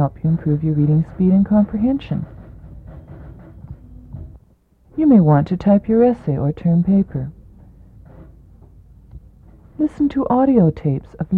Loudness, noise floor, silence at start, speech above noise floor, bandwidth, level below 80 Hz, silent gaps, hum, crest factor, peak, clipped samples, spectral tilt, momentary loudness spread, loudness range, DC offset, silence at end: -17 LUFS; -54 dBFS; 0 s; 38 dB; 4.5 kHz; -42 dBFS; none; none; 16 dB; -2 dBFS; under 0.1%; -11.5 dB/octave; 25 LU; 10 LU; under 0.1%; 0 s